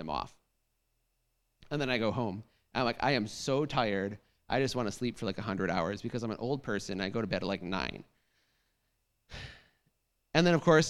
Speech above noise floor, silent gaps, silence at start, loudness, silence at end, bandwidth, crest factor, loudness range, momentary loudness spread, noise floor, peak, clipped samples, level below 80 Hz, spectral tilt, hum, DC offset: 47 dB; none; 0 s; -33 LUFS; 0 s; 13 kHz; 24 dB; 6 LU; 17 LU; -78 dBFS; -10 dBFS; under 0.1%; -58 dBFS; -5.5 dB/octave; none; under 0.1%